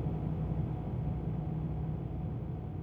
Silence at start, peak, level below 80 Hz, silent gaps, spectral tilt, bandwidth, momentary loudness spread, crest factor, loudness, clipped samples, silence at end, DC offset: 0 s; -22 dBFS; -44 dBFS; none; -11.5 dB/octave; 3.7 kHz; 3 LU; 14 dB; -37 LUFS; under 0.1%; 0 s; under 0.1%